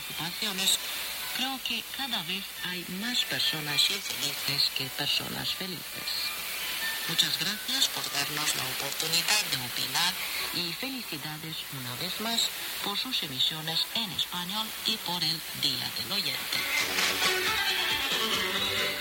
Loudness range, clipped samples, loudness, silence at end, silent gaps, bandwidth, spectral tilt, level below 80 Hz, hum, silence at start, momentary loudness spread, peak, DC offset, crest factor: 3 LU; under 0.1%; -28 LUFS; 0 s; none; 17 kHz; -1 dB/octave; -62 dBFS; none; 0 s; 8 LU; -10 dBFS; under 0.1%; 20 dB